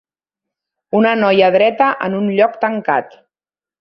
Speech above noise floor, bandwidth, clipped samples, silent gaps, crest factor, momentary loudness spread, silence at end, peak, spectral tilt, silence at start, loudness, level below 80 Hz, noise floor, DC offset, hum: over 76 dB; 6 kHz; under 0.1%; none; 14 dB; 7 LU; 0.75 s; -2 dBFS; -8.5 dB/octave; 0.95 s; -14 LUFS; -62 dBFS; under -90 dBFS; under 0.1%; none